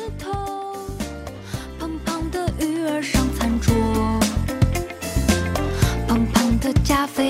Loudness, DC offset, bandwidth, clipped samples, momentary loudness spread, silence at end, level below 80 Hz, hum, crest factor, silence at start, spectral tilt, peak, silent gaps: -22 LUFS; under 0.1%; 16 kHz; under 0.1%; 11 LU; 0 s; -28 dBFS; none; 16 dB; 0 s; -5.5 dB/octave; -6 dBFS; none